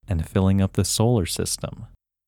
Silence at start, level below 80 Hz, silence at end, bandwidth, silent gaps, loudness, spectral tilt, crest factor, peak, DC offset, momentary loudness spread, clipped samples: 0.1 s; -40 dBFS; 0.4 s; 17 kHz; none; -22 LUFS; -5.5 dB/octave; 16 dB; -6 dBFS; under 0.1%; 10 LU; under 0.1%